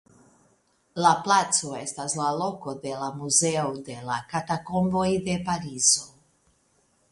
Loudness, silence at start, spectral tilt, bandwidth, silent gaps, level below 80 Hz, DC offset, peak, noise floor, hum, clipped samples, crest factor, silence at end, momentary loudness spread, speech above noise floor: -25 LUFS; 0.95 s; -3 dB/octave; 11.5 kHz; none; -60 dBFS; under 0.1%; -6 dBFS; -66 dBFS; none; under 0.1%; 20 dB; 1.05 s; 12 LU; 41 dB